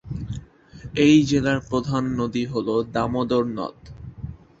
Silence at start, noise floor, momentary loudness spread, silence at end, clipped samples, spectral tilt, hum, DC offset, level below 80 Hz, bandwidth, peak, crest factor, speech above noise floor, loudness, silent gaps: 0.05 s; -42 dBFS; 21 LU; 0.25 s; under 0.1%; -6.5 dB/octave; none; under 0.1%; -46 dBFS; 7.8 kHz; -6 dBFS; 18 dB; 21 dB; -22 LUFS; none